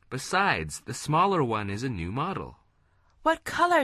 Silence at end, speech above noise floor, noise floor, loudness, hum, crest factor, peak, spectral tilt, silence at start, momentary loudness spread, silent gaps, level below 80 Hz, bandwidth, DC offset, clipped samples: 0 s; 38 dB; -65 dBFS; -27 LUFS; none; 18 dB; -10 dBFS; -5 dB/octave; 0.1 s; 11 LU; none; -50 dBFS; 13.5 kHz; under 0.1%; under 0.1%